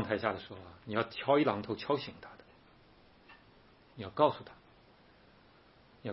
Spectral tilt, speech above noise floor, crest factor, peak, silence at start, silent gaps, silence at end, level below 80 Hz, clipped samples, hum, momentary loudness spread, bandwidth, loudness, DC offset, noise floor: -4 dB/octave; 29 dB; 24 dB; -12 dBFS; 0 s; none; 0 s; -70 dBFS; under 0.1%; none; 20 LU; 5.8 kHz; -33 LUFS; under 0.1%; -62 dBFS